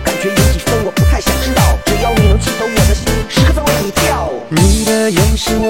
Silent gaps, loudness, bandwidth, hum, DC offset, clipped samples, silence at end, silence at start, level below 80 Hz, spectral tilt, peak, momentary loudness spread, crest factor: none; -13 LUFS; 17 kHz; none; 0.6%; under 0.1%; 0 s; 0 s; -18 dBFS; -4.5 dB/octave; 0 dBFS; 3 LU; 12 dB